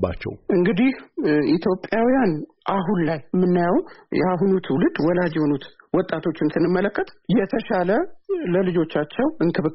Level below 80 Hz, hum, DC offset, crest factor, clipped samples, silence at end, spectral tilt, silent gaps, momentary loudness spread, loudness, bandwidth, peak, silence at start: -50 dBFS; none; under 0.1%; 14 dB; under 0.1%; 0 s; -6.5 dB/octave; none; 6 LU; -22 LUFS; 5.8 kHz; -6 dBFS; 0 s